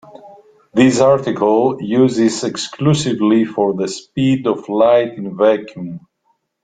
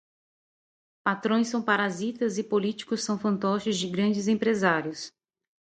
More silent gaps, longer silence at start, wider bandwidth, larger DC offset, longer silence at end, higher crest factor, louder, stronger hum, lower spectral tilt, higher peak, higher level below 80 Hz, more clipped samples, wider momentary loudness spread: neither; second, 0.15 s vs 1.05 s; about the same, 9.4 kHz vs 9.2 kHz; neither; about the same, 0.65 s vs 0.7 s; about the same, 16 dB vs 20 dB; first, -15 LUFS vs -27 LUFS; neither; about the same, -6 dB/octave vs -5 dB/octave; first, 0 dBFS vs -8 dBFS; first, -54 dBFS vs -70 dBFS; neither; first, 10 LU vs 6 LU